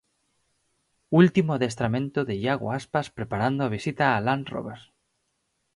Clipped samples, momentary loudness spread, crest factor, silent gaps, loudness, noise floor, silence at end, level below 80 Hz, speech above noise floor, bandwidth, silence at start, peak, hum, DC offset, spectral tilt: under 0.1%; 10 LU; 20 dB; none; -25 LUFS; -75 dBFS; 0.95 s; -58 dBFS; 51 dB; 11.5 kHz; 1.1 s; -6 dBFS; none; under 0.1%; -7 dB/octave